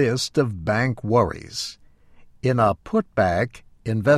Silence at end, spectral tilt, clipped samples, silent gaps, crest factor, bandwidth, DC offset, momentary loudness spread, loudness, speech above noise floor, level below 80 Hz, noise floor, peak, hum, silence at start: 0 s; -6 dB/octave; under 0.1%; none; 16 dB; 14 kHz; under 0.1%; 9 LU; -23 LUFS; 28 dB; -48 dBFS; -49 dBFS; -6 dBFS; none; 0 s